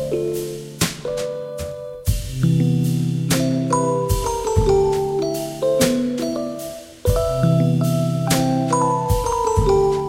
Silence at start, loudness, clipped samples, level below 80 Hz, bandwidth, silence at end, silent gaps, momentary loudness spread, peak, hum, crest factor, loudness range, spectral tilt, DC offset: 0 s; -20 LUFS; under 0.1%; -32 dBFS; 16.5 kHz; 0 s; none; 9 LU; -4 dBFS; none; 16 dB; 2 LU; -6 dB/octave; under 0.1%